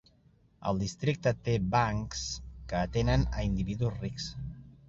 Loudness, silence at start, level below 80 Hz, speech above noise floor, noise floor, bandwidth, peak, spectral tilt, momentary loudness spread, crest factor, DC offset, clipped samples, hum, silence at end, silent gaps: -32 LUFS; 0.6 s; -42 dBFS; 34 dB; -64 dBFS; 7.8 kHz; -14 dBFS; -6 dB/octave; 10 LU; 18 dB; under 0.1%; under 0.1%; none; 0.15 s; none